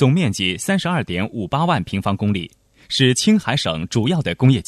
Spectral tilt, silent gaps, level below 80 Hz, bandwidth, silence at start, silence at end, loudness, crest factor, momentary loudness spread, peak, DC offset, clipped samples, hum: -5 dB/octave; none; -48 dBFS; 13.5 kHz; 0 s; 0.05 s; -19 LUFS; 16 dB; 7 LU; -2 dBFS; under 0.1%; under 0.1%; none